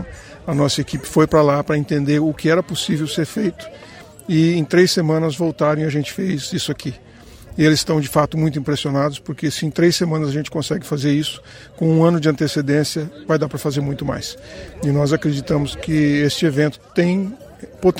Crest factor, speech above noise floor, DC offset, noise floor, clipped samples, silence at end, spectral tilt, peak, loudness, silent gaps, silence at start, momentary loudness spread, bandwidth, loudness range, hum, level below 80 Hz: 18 dB; 22 dB; under 0.1%; -40 dBFS; under 0.1%; 0 s; -6 dB/octave; 0 dBFS; -19 LUFS; none; 0 s; 12 LU; 16.5 kHz; 2 LU; none; -46 dBFS